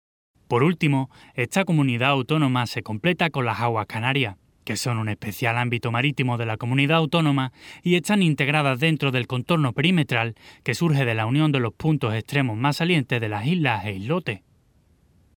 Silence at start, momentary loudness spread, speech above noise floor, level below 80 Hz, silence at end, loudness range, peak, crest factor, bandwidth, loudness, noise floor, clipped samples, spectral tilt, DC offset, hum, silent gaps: 0.5 s; 8 LU; 38 dB; -60 dBFS; 1 s; 3 LU; -4 dBFS; 18 dB; 18 kHz; -23 LUFS; -60 dBFS; under 0.1%; -6 dB/octave; under 0.1%; none; none